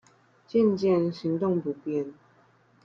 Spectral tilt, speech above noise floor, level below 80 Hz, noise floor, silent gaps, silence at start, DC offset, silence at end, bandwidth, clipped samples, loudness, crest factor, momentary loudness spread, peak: -8.5 dB/octave; 36 dB; -70 dBFS; -61 dBFS; none; 0.55 s; under 0.1%; 0.75 s; 7.4 kHz; under 0.1%; -27 LUFS; 16 dB; 9 LU; -12 dBFS